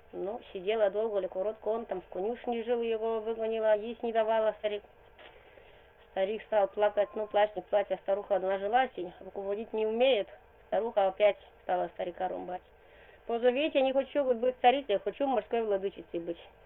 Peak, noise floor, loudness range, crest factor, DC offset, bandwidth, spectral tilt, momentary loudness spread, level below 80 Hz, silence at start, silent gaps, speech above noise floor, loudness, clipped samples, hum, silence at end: -12 dBFS; -57 dBFS; 3 LU; 20 dB; under 0.1%; 4.1 kHz; -8 dB/octave; 11 LU; -66 dBFS; 0.15 s; none; 27 dB; -31 LUFS; under 0.1%; none; 0.15 s